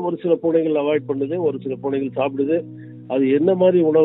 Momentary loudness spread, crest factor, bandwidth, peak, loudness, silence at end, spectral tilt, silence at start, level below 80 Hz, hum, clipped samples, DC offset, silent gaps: 9 LU; 14 dB; 4 kHz; -4 dBFS; -20 LUFS; 0 s; -12 dB/octave; 0 s; -68 dBFS; none; under 0.1%; under 0.1%; none